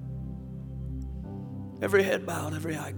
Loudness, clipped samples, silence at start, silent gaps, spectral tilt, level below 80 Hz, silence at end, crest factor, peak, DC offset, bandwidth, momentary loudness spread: -31 LUFS; under 0.1%; 0 s; none; -6 dB/octave; -44 dBFS; 0 s; 22 dB; -10 dBFS; under 0.1%; over 20 kHz; 15 LU